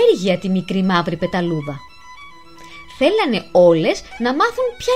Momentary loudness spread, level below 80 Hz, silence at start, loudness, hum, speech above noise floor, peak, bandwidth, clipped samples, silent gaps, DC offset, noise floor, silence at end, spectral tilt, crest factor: 13 LU; -50 dBFS; 0 s; -17 LUFS; none; 24 dB; -2 dBFS; 14.5 kHz; under 0.1%; none; 0.7%; -41 dBFS; 0 s; -6 dB/octave; 16 dB